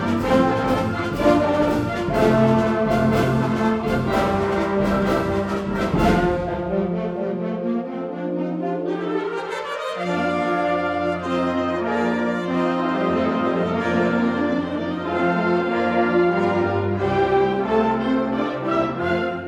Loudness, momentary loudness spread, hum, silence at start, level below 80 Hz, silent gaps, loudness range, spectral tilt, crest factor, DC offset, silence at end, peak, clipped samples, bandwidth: -21 LUFS; 7 LU; none; 0 s; -42 dBFS; none; 5 LU; -7 dB/octave; 16 dB; under 0.1%; 0 s; -4 dBFS; under 0.1%; 17 kHz